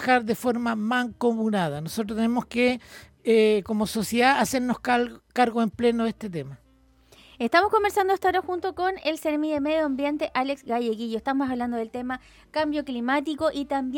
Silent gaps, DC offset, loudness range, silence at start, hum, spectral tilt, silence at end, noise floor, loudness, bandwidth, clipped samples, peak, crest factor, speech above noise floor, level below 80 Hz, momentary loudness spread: none; under 0.1%; 4 LU; 0 s; none; -5 dB/octave; 0 s; -58 dBFS; -25 LUFS; 17.5 kHz; under 0.1%; -4 dBFS; 20 dB; 33 dB; -56 dBFS; 10 LU